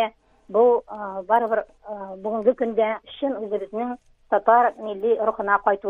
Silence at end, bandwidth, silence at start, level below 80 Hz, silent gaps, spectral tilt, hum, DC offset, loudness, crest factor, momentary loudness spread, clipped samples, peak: 0 s; 3.9 kHz; 0 s; -60 dBFS; none; -7 dB/octave; none; under 0.1%; -23 LUFS; 18 dB; 13 LU; under 0.1%; -4 dBFS